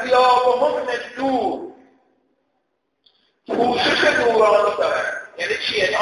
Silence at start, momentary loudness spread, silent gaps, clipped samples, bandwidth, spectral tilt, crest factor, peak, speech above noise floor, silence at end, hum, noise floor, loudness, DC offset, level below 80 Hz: 0 s; 11 LU; none; under 0.1%; 11.5 kHz; -3 dB/octave; 16 dB; -4 dBFS; 52 dB; 0 s; none; -71 dBFS; -18 LUFS; under 0.1%; -56 dBFS